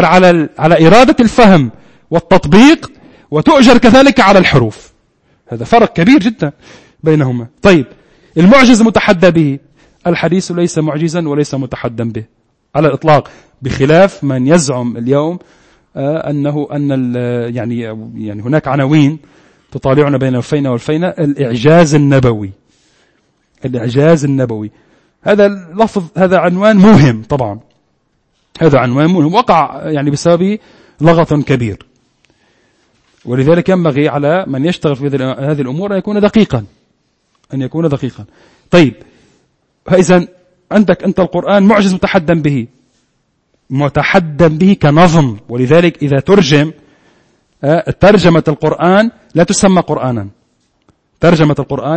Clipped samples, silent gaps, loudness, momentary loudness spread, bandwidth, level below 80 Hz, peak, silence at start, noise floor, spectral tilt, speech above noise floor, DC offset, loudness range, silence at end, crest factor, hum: 0.7%; none; -10 LUFS; 14 LU; 11 kHz; -38 dBFS; 0 dBFS; 0 s; -60 dBFS; -6.5 dB/octave; 51 dB; under 0.1%; 7 LU; 0 s; 10 dB; none